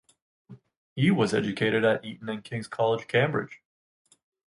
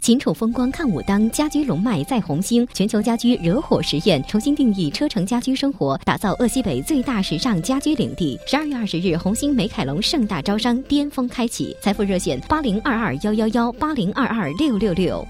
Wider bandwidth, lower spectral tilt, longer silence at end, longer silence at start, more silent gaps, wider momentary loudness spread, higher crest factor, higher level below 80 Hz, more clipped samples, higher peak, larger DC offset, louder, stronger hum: second, 11 kHz vs 16 kHz; first, -6.5 dB/octave vs -5 dB/octave; first, 0.95 s vs 0 s; first, 0.5 s vs 0 s; first, 0.77-0.96 s vs none; first, 12 LU vs 4 LU; about the same, 18 dB vs 18 dB; second, -66 dBFS vs -40 dBFS; neither; second, -10 dBFS vs -2 dBFS; neither; second, -26 LUFS vs -20 LUFS; neither